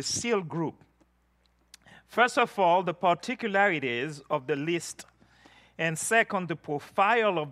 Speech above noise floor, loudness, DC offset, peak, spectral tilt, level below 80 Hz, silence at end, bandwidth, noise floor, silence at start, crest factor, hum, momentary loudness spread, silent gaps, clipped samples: 41 dB; -27 LUFS; under 0.1%; -8 dBFS; -3.5 dB/octave; -72 dBFS; 0 s; 14.5 kHz; -68 dBFS; 0 s; 20 dB; 60 Hz at -65 dBFS; 10 LU; none; under 0.1%